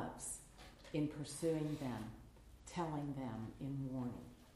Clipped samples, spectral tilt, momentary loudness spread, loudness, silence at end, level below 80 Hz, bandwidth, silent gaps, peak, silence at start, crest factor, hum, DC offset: under 0.1%; -6 dB/octave; 18 LU; -44 LUFS; 0 s; -64 dBFS; 15 kHz; none; -28 dBFS; 0 s; 16 dB; none; under 0.1%